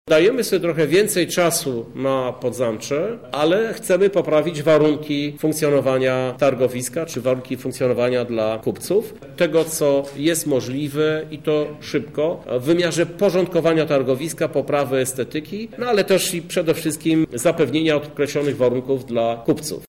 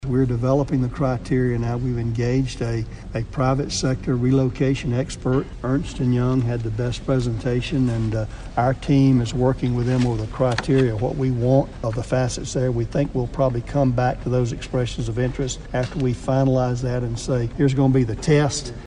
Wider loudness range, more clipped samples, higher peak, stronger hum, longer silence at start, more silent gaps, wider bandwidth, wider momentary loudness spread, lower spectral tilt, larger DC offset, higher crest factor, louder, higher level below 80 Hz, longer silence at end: about the same, 2 LU vs 2 LU; neither; about the same, -6 dBFS vs -4 dBFS; neither; about the same, 0.05 s vs 0 s; neither; first, 16.5 kHz vs 10 kHz; about the same, 7 LU vs 6 LU; second, -5 dB/octave vs -7 dB/octave; first, 0.2% vs under 0.1%; about the same, 12 dB vs 16 dB; about the same, -20 LUFS vs -22 LUFS; second, -56 dBFS vs -36 dBFS; about the same, 0.05 s vs 0 s